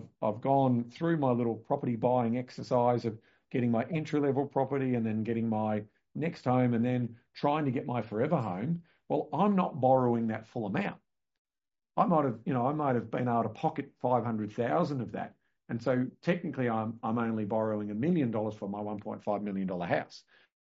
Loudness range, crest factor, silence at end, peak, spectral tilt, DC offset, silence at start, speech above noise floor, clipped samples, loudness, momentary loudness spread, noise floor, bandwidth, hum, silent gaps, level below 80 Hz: 3 LU; 18 dB; 0.55 s; -12 dBFS; -7.5 dB/octave; under 0.1%; 0 s; over 60 dB; under 0.1%; -31 LUFS; 9 LU; under -90 dBFS; 7.6 kHz; none; 11.39-11.45 s; -70 dBFS